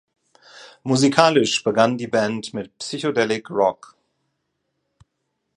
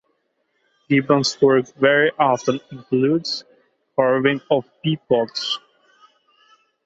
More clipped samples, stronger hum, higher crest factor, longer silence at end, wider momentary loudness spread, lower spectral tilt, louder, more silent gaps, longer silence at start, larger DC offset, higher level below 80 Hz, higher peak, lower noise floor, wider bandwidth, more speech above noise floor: neither; neither; about the same, 22 dB vs 18 dB; first, 1.85 s vs 1.25 s; first, 15 LU vs 9 LU; about the same, -4.5 dB/octave vs -5 dB/octave; about the same, -20 LUFS vs -19 LUFS; neither; second, 0.55 s vs 0.9 s; neither; about the same, -66 dBFS vs -64 dBFS; about the same, 0 dBFS vs -2 dBFS; first, -75 dBFS vs -69 dBFS; first, 11.5 kHz vs 8 kHz; first, 56 dB vs 51 dB